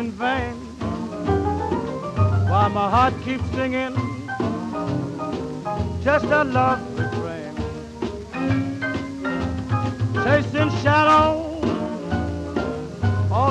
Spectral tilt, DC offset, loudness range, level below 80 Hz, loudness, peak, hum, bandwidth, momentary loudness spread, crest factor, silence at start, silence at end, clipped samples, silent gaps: -7 dB/octave; under 0.1%; 4 LU; -40 dBFS; -22 LUFS; -6 dBFS; none; 9.4 kHz; 10 LU; 16 dB; 0 s; 0 s; under 0.1%; none